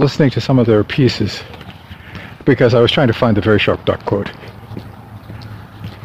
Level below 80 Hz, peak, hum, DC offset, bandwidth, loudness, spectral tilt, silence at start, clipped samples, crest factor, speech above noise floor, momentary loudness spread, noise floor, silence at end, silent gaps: -42 dBFS; 0 dBFS; none; under 0.1%; 14.5 kHz; -14 LUFS; -7 dB/octave; 0 s; under 0.1%; 16 dB; 21 dB; 22 LU; -35 dBFS; 0 s; none